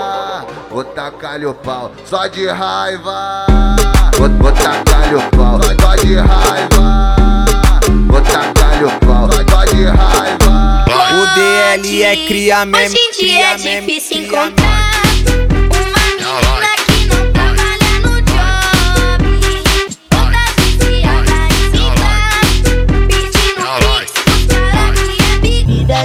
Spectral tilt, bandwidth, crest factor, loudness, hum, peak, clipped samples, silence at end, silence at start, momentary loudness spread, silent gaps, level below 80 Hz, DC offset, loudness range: -4 dB/octave; 16 kHz; 10 dB; -11 LUFS; none; 0 dBFS; under 0.1%; 0 s; 0 s; 7 LU; none; -12 dBFS; under 0.1%; 3 LU